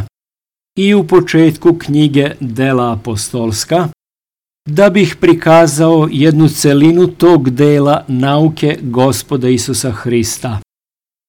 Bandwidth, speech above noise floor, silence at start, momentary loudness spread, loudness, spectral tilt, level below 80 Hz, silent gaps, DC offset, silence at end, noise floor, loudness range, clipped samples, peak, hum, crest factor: 18 kHz; over 80 dB; 0 s; 9 LU; -11 LUFS; -6 dB/octave; -44 dBFS; none; under 0.1%; 0.65 s; under -90 dBFS; 5 LU; under 0.1%; 0 dBFS; none; 12 dB